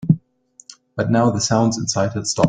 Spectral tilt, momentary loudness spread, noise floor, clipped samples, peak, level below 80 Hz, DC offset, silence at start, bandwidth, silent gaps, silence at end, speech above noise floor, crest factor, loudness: -5 dB/octave; 6 LU; -52 dBFS; under 0.1%; -2 dBFS; -50 dBFS; under 0.1%; 0 s; 9.6 kHz; none; 0 s; 35 dB; 18 dB; -19 LUFS